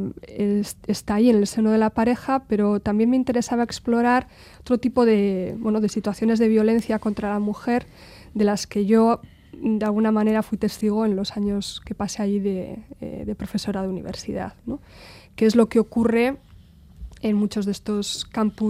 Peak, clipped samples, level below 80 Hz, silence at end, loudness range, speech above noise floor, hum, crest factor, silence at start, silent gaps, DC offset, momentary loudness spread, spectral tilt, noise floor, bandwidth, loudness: -4 dBFS; under 0.1%; -48 dBFS; 0 s; 6 LU; 27 dB; none; 18 dB; 0 s; none; under 0.1%; 12 LU; -6 dB/octave; -48 dBFS; 14 kHz; -22 LUFS